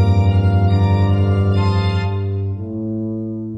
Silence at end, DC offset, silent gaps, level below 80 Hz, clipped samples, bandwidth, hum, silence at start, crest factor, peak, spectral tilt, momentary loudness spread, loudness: 0 s; under 0.1%; none; -34 dBFS; under 0.1%; 5.4 kHz; none; 0 s; 12 dB; -4 dBFS; -9 dB/octave; 9 LU; -17 LUFS